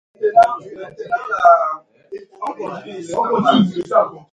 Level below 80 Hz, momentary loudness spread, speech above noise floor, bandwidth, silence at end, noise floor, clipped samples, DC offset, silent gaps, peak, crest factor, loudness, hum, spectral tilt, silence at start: -60 dBFS; 20 LU; 19 dB; 9.2 kHz; 0.15 s; -36 dBFS; under 0.1%; under 0.1%; none; 0 dBFS; 18 dB; -16 LUFS; none; -6.5 dB/octave; 0.2 s